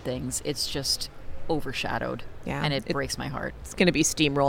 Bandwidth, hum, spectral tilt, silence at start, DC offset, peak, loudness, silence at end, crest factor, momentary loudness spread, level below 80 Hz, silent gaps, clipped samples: 17.5 kHz; none; -3.5 dB/octave; 0 s; under 0.1%; -6 dBFS; -28 LUFS; 0 s; 20 dB; 12 LU; -44 dBFS; none; under 0.1%